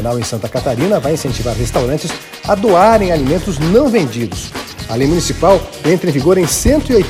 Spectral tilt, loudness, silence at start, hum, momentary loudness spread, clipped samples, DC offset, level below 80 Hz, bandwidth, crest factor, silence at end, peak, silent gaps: -5.5 dB/octave; -14 LUFS; 0 s; none; 11 LU; under 0.1%; under 0.1%; -28 dBFS; 16 kHz; 14 dB; 0 s; 0 dBFS; none